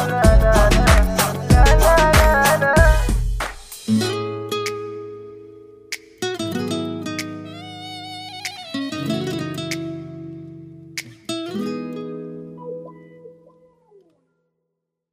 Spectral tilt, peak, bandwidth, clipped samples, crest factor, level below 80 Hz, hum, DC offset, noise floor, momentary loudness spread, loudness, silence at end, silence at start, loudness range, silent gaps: -5 dB/octave; 0 dBFS; 16 kHz; under 0.1%; 18 dB; -24 dBFS; none; under 0.1%; -78 dBFS; 21 LU; -19 LUFS; 1.85 s; 0 s; 16 LU; none